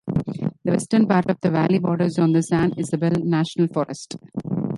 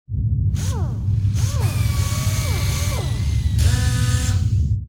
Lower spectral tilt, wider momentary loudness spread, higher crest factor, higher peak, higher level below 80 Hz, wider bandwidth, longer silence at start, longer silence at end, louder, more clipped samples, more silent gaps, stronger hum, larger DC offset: first, -7 dB/octave vs -5 dB/octave; first, 9 LU vs 4 LU; about the same, 16 dB vs 12 dB; about the same, -4 dBFS vs -6 dBFS; second, -52 dBFS vs -26 dBFS; second, 11.5 kHz vs 17 kHz; about the same, 0.05 s vs 0.1 s; about the same, 0 s vs 0 s; about the same, -21 LUFS vs -21 LUFS; neither; neither; neither; neither